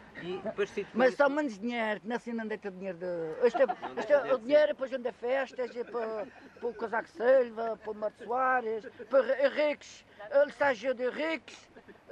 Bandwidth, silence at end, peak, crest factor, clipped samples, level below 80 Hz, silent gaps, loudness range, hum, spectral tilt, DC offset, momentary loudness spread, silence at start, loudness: 9 kHz; 0.2 s; -14 dBFS; 18 dB; under 0.1%; -72 dBFS; none; 2 LU; none; -5 dB/octave; under 0.1%; 12 LU; 0 s; -31 LUFS